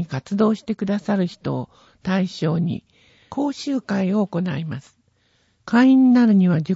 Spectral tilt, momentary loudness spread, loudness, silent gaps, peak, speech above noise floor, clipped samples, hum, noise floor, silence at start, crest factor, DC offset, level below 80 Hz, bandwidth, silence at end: -7.5 dB/octave; 17 LU; -20 LUFS; none; -6 dBFS; 44 dB; under 0.1%; none; -63 dBFS; 0 s; 14 dB; under 0.1%; -60 dBFS; 8 kHz; 0 s